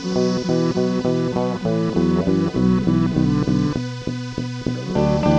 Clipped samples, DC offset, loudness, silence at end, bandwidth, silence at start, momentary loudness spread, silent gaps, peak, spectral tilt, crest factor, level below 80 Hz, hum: under 0.1%; under 0.1%; -20 LUFS; 0 s; 8.4 kHz; 0 s; 8 LU; none; -4 dBFS; -7.5 dB/octave; 16 dB; -40 dBFS; none